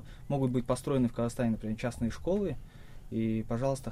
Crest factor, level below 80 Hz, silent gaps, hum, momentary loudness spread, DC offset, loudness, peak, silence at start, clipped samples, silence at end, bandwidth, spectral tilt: 16 dB; -48 dBFS; none; none; 6 LU; under 0.1%; -32 LUFS; -16 dBFS; 0 s; under 0.1%; 0 s; 14.5 kHz; -7.5 dB/octave